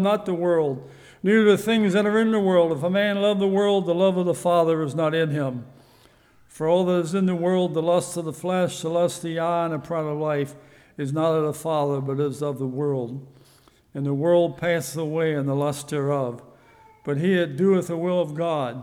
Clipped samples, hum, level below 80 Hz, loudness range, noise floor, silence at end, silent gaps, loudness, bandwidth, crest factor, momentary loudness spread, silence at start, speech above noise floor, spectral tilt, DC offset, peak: under 0.1%; none; -66 dBFS; 5 LU; -56 dBFS; 0 s; none; -23 LUFS; 16.5 kHz; 16 dB; 9 LU; 0 s; 34 dB; -6.5 dB/octave; under 0.1%; -6 dBFS